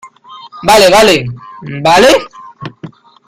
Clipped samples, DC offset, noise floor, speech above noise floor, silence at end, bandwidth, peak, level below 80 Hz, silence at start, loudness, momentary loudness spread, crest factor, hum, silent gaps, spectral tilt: 0.3%; under 0.1%; -34 dBFS; 26 dB; 0.4 s; 17 kHz; 0 dBFS; -40 dBFS; 0.05 s; -8 LUFS; 22 LU; 10 dB; none; none; -3.5 dB/octave